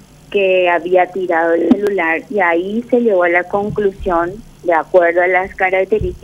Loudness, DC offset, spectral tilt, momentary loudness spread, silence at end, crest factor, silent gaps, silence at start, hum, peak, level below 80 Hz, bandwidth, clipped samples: -15 LUFS; under 0.1%; -6.5 dB/octave; 6 LU; 0.05 s; 14 dB; none; 0.3 s; none; 0 dBFS; -38 dBFS; 12 kHz; under 0.1%